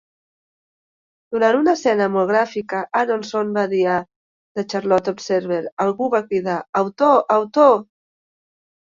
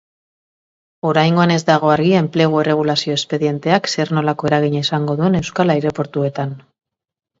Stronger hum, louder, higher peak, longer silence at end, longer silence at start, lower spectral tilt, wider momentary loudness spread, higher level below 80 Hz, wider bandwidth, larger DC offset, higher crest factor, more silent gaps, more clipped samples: neither; second, -19 LUFS vs -16 LUFS; about the same, -2 dBFS vs 0 dBFS; first, 0.95 s vs 0.8 s; first, 1.3 s vs 1.05 s; about the same, -5.5 dB/octave vs -6 dB/octave; about the same, 9 LU vs 7 LU; second, -66 dBFS vs -54 dBFS; about the same, 7.6 kHz vs 7.8 kHz; neither; about the same, 18 dB vs 16 dB; first, 4.16-4.55 s, 5.72-5.77 s, 6.69-6.73 s vs none; neither